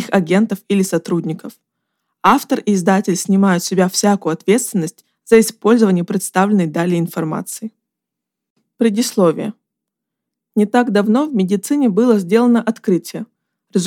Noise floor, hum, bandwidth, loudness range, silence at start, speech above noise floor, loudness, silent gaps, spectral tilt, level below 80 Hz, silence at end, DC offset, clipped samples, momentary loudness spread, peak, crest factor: -81 dBFS; none; 17.5 kHz; 5 LU; 0 s; 66 dB; -16 LUFS; 8.50-8.56 s; -5.5 dB/octave; -62 dBFS; 0 s; under 0.1%; under 0.1%; 11 LU; 0 dBFS; 16 dB